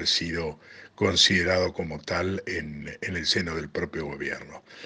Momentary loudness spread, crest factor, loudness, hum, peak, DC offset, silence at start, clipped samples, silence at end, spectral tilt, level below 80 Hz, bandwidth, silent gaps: 16 LU; 22 dB; -26 LUFS; none; -6 dBFS; under 0.1%; 0 s; under 0.1%; 0 s; -3.5 dB/octave; -50 dBFS; 10 kHz; none